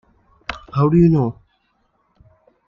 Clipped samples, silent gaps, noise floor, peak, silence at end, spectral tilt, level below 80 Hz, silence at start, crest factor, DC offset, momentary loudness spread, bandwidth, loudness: under 0.1%; none; -65 dBFS; -4 dBFS; 1.35 s; -10 dB/octave; -44 dBFS; 0.5 s; 16 dB; under 0.1%; 18 LU; 5.8 kHz; -16 LUFS